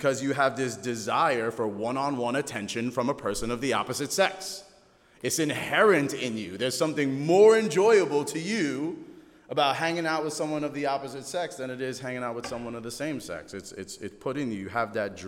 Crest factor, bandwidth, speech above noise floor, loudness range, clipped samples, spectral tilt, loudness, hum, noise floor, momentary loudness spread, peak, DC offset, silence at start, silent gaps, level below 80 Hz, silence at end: 20 dB; 16.5 kHz; 32 dB; 10 LU; under 0.1%; -4 dB/octave; -27 LUFS; none; -58 dBFS; 14 LU; -8 dBFS; under 0.1%; 0 s; none; -60 dBFS; 0 s